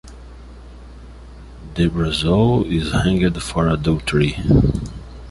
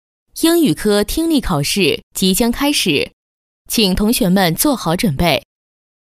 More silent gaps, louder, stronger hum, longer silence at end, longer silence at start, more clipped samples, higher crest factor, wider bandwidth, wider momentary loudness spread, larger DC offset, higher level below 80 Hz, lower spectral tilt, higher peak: second, none vs 2.03-2.11 s, 3.13-3.65 s; second, -18 LUFS vs -15 LUFS; neither; second, 0 s vs 0.8 s; second, 0.05 s vs 0.35 s; neither; about the same, 16 dB vs 16 dB; second, 11.5 kHz vs 16 kHz; first, 13 LU vs 4 LU; neither; about the same, -30 dBFS vs -34 dBFS; first, -6.5 dB/octave vs -4 dB/octave; about the same, -2 dBFS vs 0 dBFS